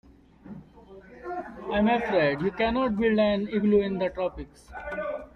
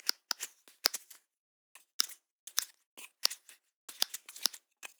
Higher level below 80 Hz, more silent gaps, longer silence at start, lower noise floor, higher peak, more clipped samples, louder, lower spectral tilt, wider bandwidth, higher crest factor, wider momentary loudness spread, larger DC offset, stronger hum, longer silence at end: first, -50 dBFS vs under -90 dBFS; second, none vs 1.37-1.75 s, 1.93-1.99 s, 2.31-2.47 s, 2.86-2.97 s, 3.74-3.88 s; first, 0.45 s vs 0.05 s; second, -49 dBFS vs -53 dBFS; second, -12 dBFS vs -2 dBFS; neither; first, -26 LUFS vs -35 LUFS; first, -8 dB/octave vs 4 dB/octave; second, 6.2 kHz vs over 20 kHz; second, 16 dB vs 40 dB; about the same, 20 LU vs 19 LU; neither; neither; about the same, 0.05 s vs 0.15 s